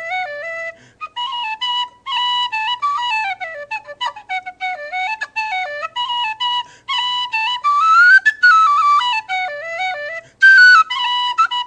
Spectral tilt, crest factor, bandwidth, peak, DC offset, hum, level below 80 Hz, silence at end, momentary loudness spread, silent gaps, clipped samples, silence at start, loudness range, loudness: 1.5 dB/octave; 16 dB; 9.4 kHz; -2 dBFS; under 0.1%; none; -66 dBFS; 0 s; 17 LU; none; under 0.1%; 0 s; 10 LU; -15 LUFS